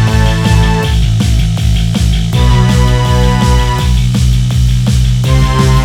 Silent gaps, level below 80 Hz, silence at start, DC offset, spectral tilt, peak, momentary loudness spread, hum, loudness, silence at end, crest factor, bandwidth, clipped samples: none; -12 dBFS; 0 s; under 0.1%; -6 dB/octave; 0 dBFS; 3 LU; none; -11 LUFS; 0 s; 8 dB; 15.5 kHz; 0.1%